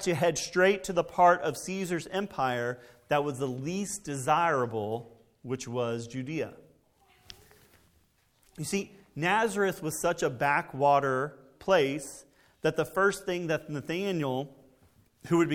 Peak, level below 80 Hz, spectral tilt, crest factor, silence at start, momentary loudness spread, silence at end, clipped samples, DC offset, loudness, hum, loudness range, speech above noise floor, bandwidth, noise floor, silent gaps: -8 dBFS; -64 dBFS; -4.5 dB/octave; 22 dB; 0 s; 12 LU; 0 s; under 0.1%; under 0.1%; -29 LUFS; none; 10 LU; 39 dB; 17.5 kHz; -68 dBFS; none